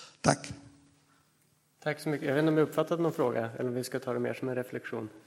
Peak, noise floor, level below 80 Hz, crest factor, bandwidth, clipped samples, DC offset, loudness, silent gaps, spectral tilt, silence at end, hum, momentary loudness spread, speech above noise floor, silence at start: -8 dBFS; -69 dBFS; -66 dBFS; 24 dB; 16.5 kHz; under 0.1%; under 0.1%; -31 LUFS; none; -5.5 dB/octave; 0.1 s; none; 11 LU; 39 dB; 0 s